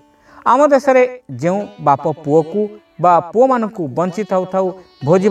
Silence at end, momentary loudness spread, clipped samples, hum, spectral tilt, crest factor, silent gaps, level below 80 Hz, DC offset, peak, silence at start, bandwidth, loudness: 0 s; 10 LU; under 0.1%; none; -7 dB/octave; 14 dB; none; -60 dBFS; under 0.1%; 0 dBFS; 0.45 s; 9.8 kHz; -16 LUFS